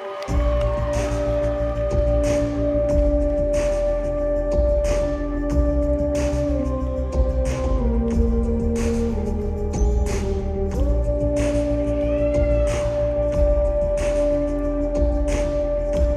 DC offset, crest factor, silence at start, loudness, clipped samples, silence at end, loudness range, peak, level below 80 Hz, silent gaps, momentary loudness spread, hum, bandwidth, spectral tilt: under 0.1%; 12 dB; 0 s; -22 LUFS; under 0.1%; 0 s; 2 LU; -8 dBFS; -24 dBFS; none; 4 LU; none; 11 kHz; -7.5 dB/octave